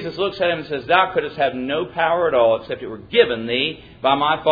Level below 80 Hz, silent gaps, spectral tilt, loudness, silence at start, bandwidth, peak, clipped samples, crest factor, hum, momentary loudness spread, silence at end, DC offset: -52 dBFS; none; -7 dB/octave; -19 LUFS; 0 s; 5 kHz; -2 dBFS; under 0.1%; 18 dB; none; 7 LU; 0 s; under 0.1%